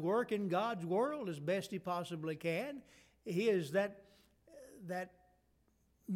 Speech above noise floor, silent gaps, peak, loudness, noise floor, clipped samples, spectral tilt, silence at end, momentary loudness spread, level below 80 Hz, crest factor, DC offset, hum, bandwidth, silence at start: 37 dB; none; -22 dBFS; -38 LUFS; -75 dBFS; under 0.1%; -6 dB/octave; 0 s; 17 LU; -76 dBFS; 16 dB; under 0.1%; none; 17 kHz; 0 s